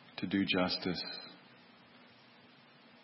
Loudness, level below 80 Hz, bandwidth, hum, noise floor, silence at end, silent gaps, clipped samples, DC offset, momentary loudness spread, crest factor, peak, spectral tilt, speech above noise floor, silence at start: -35 LUFS; -72 dBFS; 5.8 kHz; none; -61 dBFS; 1 s; none; under 0.1%; under 0.1%; 19 LU; 22 dB; -18 dBFS; -3 dB/octave; 26 dB; 0 s